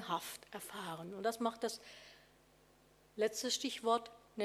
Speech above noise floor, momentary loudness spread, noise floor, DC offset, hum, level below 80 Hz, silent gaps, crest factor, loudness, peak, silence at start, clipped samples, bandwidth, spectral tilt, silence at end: 28 dB; 18 LU; -68 dBFS; under 0.1%; 50 Hz at -75 dBFS; -78 dBFS; none; 20 dB; -39 LUFS; -20 dBFS; 0 s; under 0.1%; 16.5 kHz; -2.5 dB/octave; 0 s